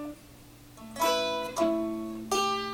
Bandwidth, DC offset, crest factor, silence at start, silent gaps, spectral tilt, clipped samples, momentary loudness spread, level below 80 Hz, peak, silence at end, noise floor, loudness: 18.5 kHz; under 0.1%; 18 dB; 0 s; none; -3 dB/octave; under 0.1%; 17 LU; -58 dBFS; -14 dBFS; 0 s; -51 dBFS; -29 LUFS